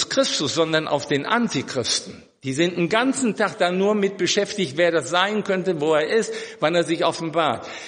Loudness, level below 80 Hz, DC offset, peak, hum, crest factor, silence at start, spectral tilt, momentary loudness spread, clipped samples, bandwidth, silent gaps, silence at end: -21 LUFS; -66 dBFS; under 0.1%; -4 dBFS; none; 18 dB; 0 s; -3.5 dB/octave; 4 LU; under 0.1%; 10 kHz; none; 0 s